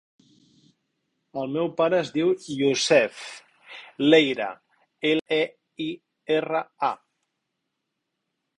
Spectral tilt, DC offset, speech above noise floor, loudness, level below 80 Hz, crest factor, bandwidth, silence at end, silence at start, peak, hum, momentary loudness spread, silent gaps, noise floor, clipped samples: -4 dB/octave; under 0.1%; 57 dB; -24 LUFS; -70 dBFS; 22 dB; 11 kHz; 1.65 s; 1.35 s; -4 dBFS; none; 20 LU; 5.21-5.25 s; -81 dBFS; under 0.1%